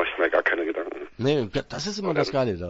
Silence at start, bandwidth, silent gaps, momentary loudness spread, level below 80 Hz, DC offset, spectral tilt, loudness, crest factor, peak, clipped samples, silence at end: 0 s; 8 kHz; none; 8 LU; -52 dBFS; under 0.1%; -5 dB/octave; -25 LUFS; 18 dB; -8 dBFS; under 0.1%; 0 s